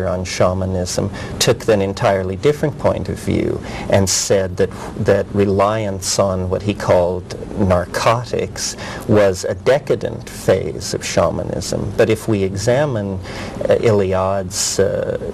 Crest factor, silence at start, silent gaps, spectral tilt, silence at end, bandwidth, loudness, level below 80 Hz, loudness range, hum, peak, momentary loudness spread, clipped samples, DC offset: 16 dB; 0 s; none; -5 dB/octave; 0 s; 16 kHz; -18 LUFS; -40 dBFS; 1 LU; none; -2 dBFS; 8 LU; under 0.1%; under 0.1%